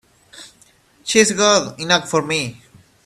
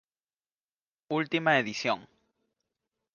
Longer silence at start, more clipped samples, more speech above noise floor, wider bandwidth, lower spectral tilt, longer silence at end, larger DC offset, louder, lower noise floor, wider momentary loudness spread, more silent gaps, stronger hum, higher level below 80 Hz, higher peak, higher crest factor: second, 0.35 s vs 1.1 s; neither; second, 37 dB vs over 62 dB; first, 13.5 kHz vs 7.2 kHz; second, -2.5 dB/octave vs -4.5 dB/octave; second, 0.55 s vs 1.1 s; neither; first, -16 LUFS vs -28 LUFS; second, -53 dBFS vs under -90 dBFS; about the same, 11 LU vs 9 LU; neither; neither; first, -58 dBFS vs -78 dBFS; first, 0 dBFS vs -10 dBFS; about the same, 20 dB vs 24 dB